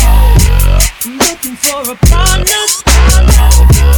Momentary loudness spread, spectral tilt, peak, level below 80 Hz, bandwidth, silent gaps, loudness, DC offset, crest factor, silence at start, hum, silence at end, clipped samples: 6 LU; -3.5 dB/octave; 0 dBFS; -8 dBFS; 19.5 kHz; none; -9 LUFS; under 0.1%; 6 dB; 0 s; none; 0 s; 2%